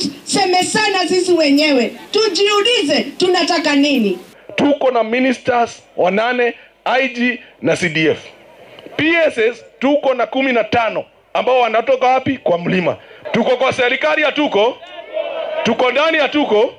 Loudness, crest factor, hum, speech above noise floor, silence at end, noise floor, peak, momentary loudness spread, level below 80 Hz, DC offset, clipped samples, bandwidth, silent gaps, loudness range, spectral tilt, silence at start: -15 LUFS; 10 dB; none; 26 dB; 0.05 s; -41 dBFS; -6 dBFS; 8 LU; -60 dBFS; under 0.1%; under 0.1%; 15 kHz; none; 3 LU; -4 dB/octave; 0 s